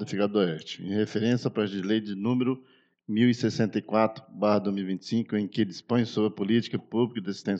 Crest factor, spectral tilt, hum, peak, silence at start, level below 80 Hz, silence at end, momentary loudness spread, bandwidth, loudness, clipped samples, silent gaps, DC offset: 18 dB; -7 dB/octave; none; -8 dBFS; 0 s; -78 dBFS; 0 s; 5 LU; 7.8 kHz; -27 LUFS; under 0.1%; none; under 0.1%